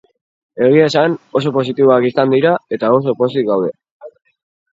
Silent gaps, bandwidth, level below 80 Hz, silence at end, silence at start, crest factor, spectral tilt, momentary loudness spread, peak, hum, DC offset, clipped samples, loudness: 3.91-4.00 s; 7.8 kHz; -62 dBFS; 0.7 s; 0.55 s; 14 dB; -7 dB/octave; 6 LU; 0 dBFS; none; under 0.1%; under 0.1%; -14 LUFS